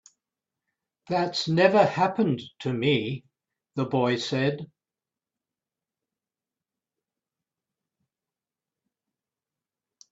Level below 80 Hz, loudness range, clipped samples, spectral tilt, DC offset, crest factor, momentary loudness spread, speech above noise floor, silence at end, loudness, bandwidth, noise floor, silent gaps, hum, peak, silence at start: -68 dBFS; 8 LU; under 0.1%; -6 dB/octave; under 0.1%; 24 dB; 15 LU; over 66 dB; 5.45 s; -25 LUFS; 8 kHz; under -90 dBFS; none; none; -6 dBFS; 1.1 s